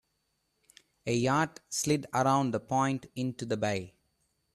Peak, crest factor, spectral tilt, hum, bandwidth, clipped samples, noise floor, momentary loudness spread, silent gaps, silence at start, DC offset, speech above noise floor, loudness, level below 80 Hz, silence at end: -12 dBFS; 18 dB; -5 dB/octave; none; 14 kHz; under 0.1%; -78 dBFS; 9 LU; none; 1.05 s; under 0.1%; 48 dB; -30 LUFS; -66 dBFS; 0.65 s